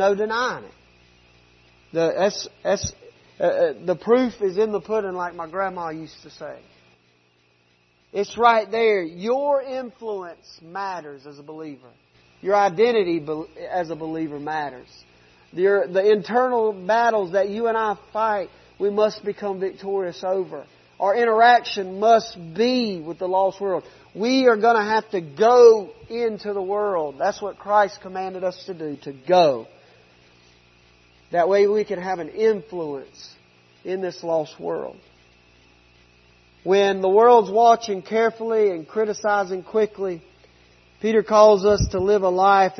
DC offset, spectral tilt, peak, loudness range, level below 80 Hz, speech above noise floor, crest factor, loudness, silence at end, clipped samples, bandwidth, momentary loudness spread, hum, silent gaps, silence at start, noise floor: under 0.1%; -5 dB/octave; -2 dBFS; 8 LU; -50 dBFS; 41 dB; 20 dB; -21 LUFS; 0.05 s; under 0.1%; 6.4 kHz; 16 LU; none; none; 0 s; -61 dBFS